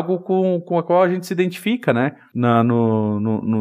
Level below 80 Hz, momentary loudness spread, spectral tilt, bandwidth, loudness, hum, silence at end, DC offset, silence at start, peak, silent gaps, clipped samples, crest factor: -70 dBFS; 5 LU; -7.5 dB/octave; 15.5 kHz; -19 LUFS; none; 0 s; under 0.1%; 0 s; -2 dBFS; none; under 0.1%; 16 dB